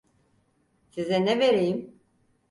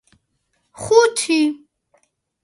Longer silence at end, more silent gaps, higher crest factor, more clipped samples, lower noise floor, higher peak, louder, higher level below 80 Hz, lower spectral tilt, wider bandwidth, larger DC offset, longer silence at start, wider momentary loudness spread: second, 0.6 s vs 0.9 s; neither; about the same, 16 dB vs 20 dB; neither; about the same, -68 dBFS vs -69 dBFS; second, -12 dBFS vs 0 dBFS; second, -25 LUFS vs -16 LUFS; second, -68 dBFS vs -58 dBFS; first, -6 dB/octave vs -3 dB/octave; about the same, 11.5 kHz vs 11.5 kHz; neither; first, 0.95 s vs 0.8 s; second, 13 LU vs 19 LU